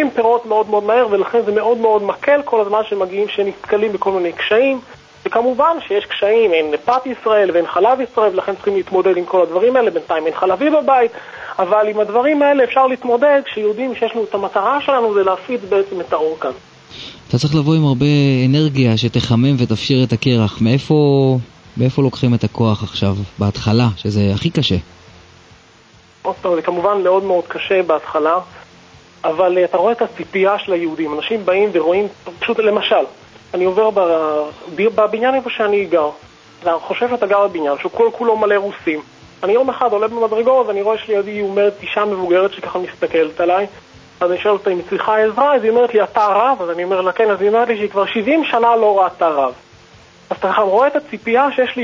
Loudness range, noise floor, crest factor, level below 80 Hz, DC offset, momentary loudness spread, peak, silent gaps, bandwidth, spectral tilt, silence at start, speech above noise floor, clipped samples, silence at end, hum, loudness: 3 LU; -47 dBFS; 14 dB; -46 dBFS; under 0.1%; 7 LU; 0 dBFS; none; 8 kHz; -7 dB/octave; 0 s; 32 dB; under 0.1%; 0 s; none; -16 LUFS